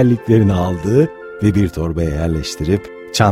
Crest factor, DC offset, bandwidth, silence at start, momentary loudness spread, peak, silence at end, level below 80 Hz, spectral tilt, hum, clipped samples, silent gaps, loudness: 16 dB; under 0.1%; 15 kHz; 0 s; 7 LU; 0 dBFS; 0 s; -32 dBFS; -6.5 dB/octave; none; under 0.1%; none; -17 LUFS